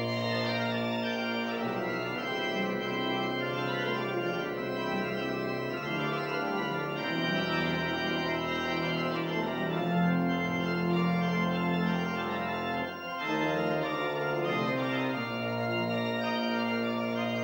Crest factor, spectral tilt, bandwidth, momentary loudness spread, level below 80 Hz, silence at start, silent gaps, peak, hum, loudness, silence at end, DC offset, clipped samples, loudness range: 14 dB; -6.5 dB/octave; 16 kHz; 4 LU; -64 dBFS; 0 s; none; -16 dBFS; none; -31 LUFS; 0 s; under 0.1%; under 0.1%; 2 LU